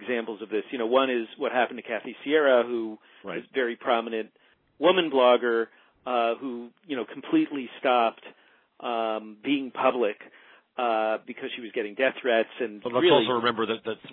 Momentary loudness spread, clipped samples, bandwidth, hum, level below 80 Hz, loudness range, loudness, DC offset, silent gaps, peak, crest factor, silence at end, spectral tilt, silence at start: 14 LU; under 0.1%; 4.3 kHz; none; -82 dBFS; 3 LU; -26 LUFS; under 0.1%; none; -8 dBFS; 20 dB; 0 s; -8 dB/octave; 0 s